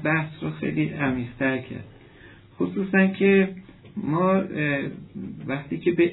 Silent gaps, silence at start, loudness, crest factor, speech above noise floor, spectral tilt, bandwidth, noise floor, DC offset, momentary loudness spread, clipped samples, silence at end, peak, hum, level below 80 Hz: none; 0 s; -24 LUFS; 18 dB; 25 dB; -11 dB/octave; 4.1 kHz; -49 dBFS; under 0.1%; 17 LU; under 0.1%; 0 s; -6 dBFS; none; -56 dBFS